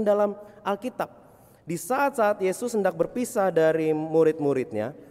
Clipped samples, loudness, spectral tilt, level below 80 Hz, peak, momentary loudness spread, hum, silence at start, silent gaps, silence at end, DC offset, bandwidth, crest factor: under 0.1%; -25 LUFS; -6 dB/octave; -66 dBFS; -10 dBFS; 11 LU; none; 0 s; none; 0.05 s; under 0.1%; 16 kHz; 16 dB